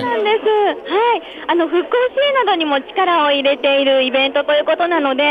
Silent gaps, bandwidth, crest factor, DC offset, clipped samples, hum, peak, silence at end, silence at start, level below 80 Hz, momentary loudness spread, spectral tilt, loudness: none; 5 kHz; 12 dB; under 0.1%; under 0.1%; none; -4 dBFS; 0 s; 0 s; -62 dBFS; 4 LU; -5 dB/octave; -15 LUFS